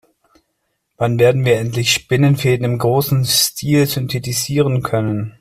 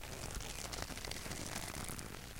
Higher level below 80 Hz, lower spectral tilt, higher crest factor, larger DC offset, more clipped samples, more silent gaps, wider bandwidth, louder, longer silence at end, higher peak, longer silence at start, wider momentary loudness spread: about the same, -48 dBFS vs -52 dBFS; first, -4.5 dB/octave vs -3 dB/octave; second, 14 dB vs 24 dB; neither; neither; neither; about the same, 16 kHz vs 17 kHz; first, -16 LUFS vs -44 LUFS; about the same, 0.1 s vs 0 s; first, -2 dBFS vs -22 dBFS; first, 1 s vs 0 s; first, 6 LU vs 2 LU